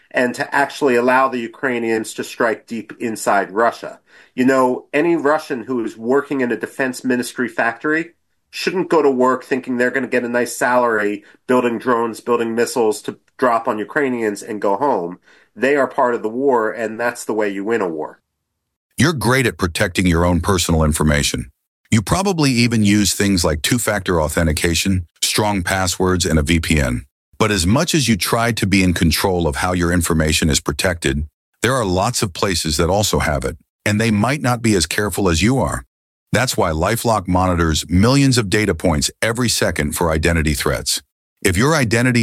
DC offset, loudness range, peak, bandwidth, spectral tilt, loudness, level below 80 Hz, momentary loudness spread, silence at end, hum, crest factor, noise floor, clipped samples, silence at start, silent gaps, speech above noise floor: under 0.1%; 3 LU; -2 dBFS; 16.5 kHz; -4.5 dB/octave; -17 LUFS; -34 dBFS; 7 LU; 0 s; none; 14 dB; -75 dBFS; under 0.1%; 0.15 s; 18.76-18.90 s, 21.67-21.84 s, 27.11-27.32 s, 31.34-31.53 s, 33.69-33.79 s, 35.87-36.26 s, 41.12-41.36 s; 58 dB